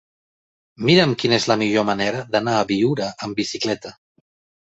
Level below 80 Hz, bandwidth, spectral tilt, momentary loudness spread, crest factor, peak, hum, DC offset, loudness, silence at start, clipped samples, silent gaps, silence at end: -56 dBFS; 8.2 kHz; -5 dB/octave; 10 LU; 20 dB; -2 dBFS; none; under 0.1%; -20 LUFS; 0.8 s; under 0.1%; none; 0.75 s